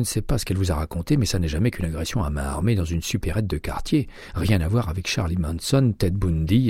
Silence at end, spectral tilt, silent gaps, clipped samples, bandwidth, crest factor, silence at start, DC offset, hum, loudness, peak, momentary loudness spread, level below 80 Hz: 0 s; -6 dB/octave; none; under 0.1%; 16 kHz; 16 dB; 0 s; under 0.1%; none; -24 LUFS; -6 dBFS; 6 LU; -32 dBFS